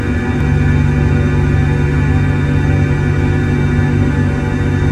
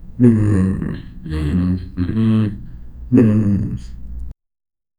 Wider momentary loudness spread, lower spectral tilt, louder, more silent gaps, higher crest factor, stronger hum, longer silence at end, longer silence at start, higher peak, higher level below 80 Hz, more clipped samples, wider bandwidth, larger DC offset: second, 2 LU vs 21 LU; second, -8 dB/octave vs -9.5 dB/octave; first, -14 LUFS vs -17 LUFS; neither; second, 12 dB vs 18 dB; neither; second, 0 s vs 0.65 s; about the same, 0 s vs 0 s; about the same, 0 dBFS vs 0 dBFS; first, -20 dBFS vs -32 dBFS; neither; second, 8.8 kHz vs 10 kHz; neither